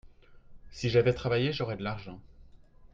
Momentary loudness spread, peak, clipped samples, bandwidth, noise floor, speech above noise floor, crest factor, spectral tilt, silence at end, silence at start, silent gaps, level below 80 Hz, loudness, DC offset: 23 LU; -12 dBFS; under 0.1%; 7.6 kHz; -54 dBFS; 25 dB; 20 dB; -6.5 dB/octave; 0.05 s; 0.05 s; none; -52 dBFS; -30 LUFS; under 0.1%